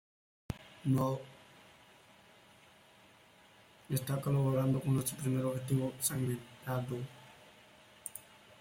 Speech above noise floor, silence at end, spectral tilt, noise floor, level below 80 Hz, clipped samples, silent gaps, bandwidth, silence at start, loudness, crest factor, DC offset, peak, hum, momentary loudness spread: 28 dB; 0.4 s; -6 dB/octave; -62 dBFS; -66 dBFS; under 0.1%; none; 16.5 kHz; 0.5 s; -35 LUFS; 20 dB; under 0.1%; -18 dBFS; none; 18 LU